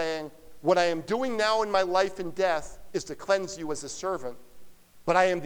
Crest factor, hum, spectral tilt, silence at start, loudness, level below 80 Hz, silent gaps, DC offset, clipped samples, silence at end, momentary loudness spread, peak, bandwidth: 20 dB; none; -4 dB/octave; 0 s; -28 LUFS; -56 dBFS; none; under 0.1%; under 0.1%; 0 s; 12 LU; -8 dBFS; over 20 kHz